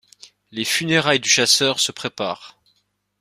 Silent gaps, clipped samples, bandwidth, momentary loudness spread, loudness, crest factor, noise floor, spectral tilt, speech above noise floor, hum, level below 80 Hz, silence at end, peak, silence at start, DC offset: none; under 0.1%; 15.5 kHz; 13 LU; -18 LUFS; 20 dB; -68 dBFS; -2 dB/octave; 48 dB; none; -62 dBFS; 0.7 s; -2 dBFS; 0.55 s; under 0.1%